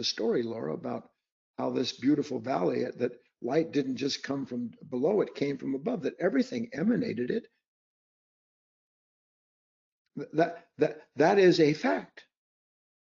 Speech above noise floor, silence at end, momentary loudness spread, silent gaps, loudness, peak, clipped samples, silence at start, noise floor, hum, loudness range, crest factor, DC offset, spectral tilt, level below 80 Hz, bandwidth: over 61 dB; 0.9 s; 11 LU; 1.32-1.54 s, 7.66-10.05 s; -29 LUFS; -12 dBFS; under 0.1%; 0 s; under -90 dBFS; none; 8 LU; 18 dB; under 0.1%; -4.5 dB/octave; -76 dBFS; 7.4 kHz